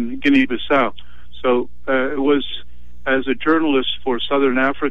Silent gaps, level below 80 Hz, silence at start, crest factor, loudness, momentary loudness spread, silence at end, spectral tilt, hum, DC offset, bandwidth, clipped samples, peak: none; -46 dBFS; 0 s; 16 dB; -18 LUFS; 7 LU; 0 s; -6.5 dB/octave; 60 Hz at -45 dBFS; 6%; 6.4 kHz; under 0.1%; -4 dBFS